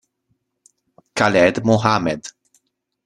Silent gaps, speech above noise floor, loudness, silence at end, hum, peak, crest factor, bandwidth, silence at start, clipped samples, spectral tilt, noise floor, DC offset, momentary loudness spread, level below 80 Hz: none; 54 dB; -17 LUFS; 0.75 s; none; -2 dBFS; 20 dB; 11.5 kHz; 1.15 s; under 0.1%; -5.5 dB/octave; -70 dBFS; under 0.1%; 15 LU; -54 dBFS